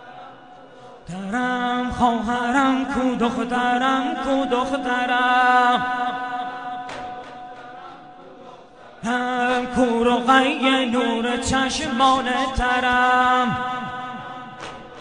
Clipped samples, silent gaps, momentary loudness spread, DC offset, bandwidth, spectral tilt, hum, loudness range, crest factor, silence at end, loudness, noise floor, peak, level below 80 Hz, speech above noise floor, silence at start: under 0.1%; none; 19 LU; 0.2%; 10.5 kHz; -4 dB/octave; none; 7 LU; 18 dB; 0 s; -20 LUFS; -44 dBFS; -4 dBFS; -44 dBFS; 25 dB; 0 s